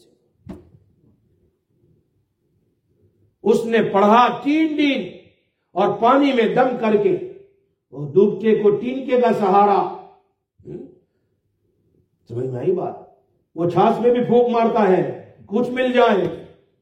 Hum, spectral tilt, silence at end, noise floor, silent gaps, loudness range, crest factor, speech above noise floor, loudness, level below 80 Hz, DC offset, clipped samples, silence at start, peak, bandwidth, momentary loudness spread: none; -7 dB/octave; 0.35 s; -68 dBFS; none; 10 LU; 18 dB; 52 dB; -18 LUFS; -64 dBFS; under 0.1%; under 0.1%; 0.5 s; -2 dBFS; 10 kHz; 19 LU